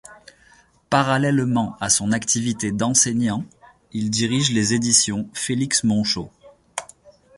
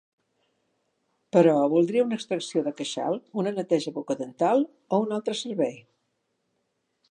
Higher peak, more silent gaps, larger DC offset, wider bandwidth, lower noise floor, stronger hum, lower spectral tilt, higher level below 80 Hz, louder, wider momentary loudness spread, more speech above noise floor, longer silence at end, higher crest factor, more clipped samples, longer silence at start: first, -2 dBFS vs -6 dBFS; neither; neither; about the same, 11.5 kHz vs 11 kHz; second, -55 dBFS vs -76 dBFS; neither; second, -3.5 dB/octave vs -6 dB/octave; first, -54 dBFS vs -82 dBFS; first, -20 LUFS vs -26 LUFS; first, 16 LU vs 10 LU; second, 34 dB vs 51 dB; second, 0.55 s vs 1.3 s; about the same, 20 dB vs 20 dB; neither; second, 0.1 s vs 1.35 s